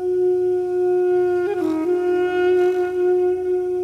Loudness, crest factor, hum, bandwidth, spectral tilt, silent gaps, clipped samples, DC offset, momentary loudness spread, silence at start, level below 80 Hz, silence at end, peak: -19 LUFS; 10 dB; none; 5.8 kHz; -6.5 dB/octave; none; under 0.1%; under 0.1%; 3 LU; 0 s; -56 dBFS; 0 s; -10 dBFS